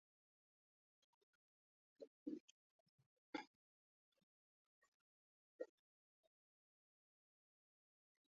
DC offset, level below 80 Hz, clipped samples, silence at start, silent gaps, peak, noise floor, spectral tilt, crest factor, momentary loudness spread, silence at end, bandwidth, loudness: under 0.1%; under -90 dBFS; under 0.1%; 2 s; 2.07-2.26 s, 2.40-2.98 s, 3.06-3.33 s, 3.47-4.12 s, 4.23-4.82 s, 4.88-5.59 s; -34 dBFS; under -90 dBFS; -2.5 dB/octave; 30 dB; 11 LU; 2.7 s; 6.6 kHz; -57 LUFS